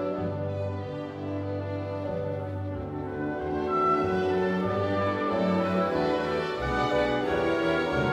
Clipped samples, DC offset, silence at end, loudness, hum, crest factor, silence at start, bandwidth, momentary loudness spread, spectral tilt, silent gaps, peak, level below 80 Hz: under 0.1%; under 0.1%; 0 s; -28 LUFS; none; 14 dB; 0 s; 11.5 kHz; 8 LU; -7.5 dB/octave; none; -14 dBFS; -48 dBFS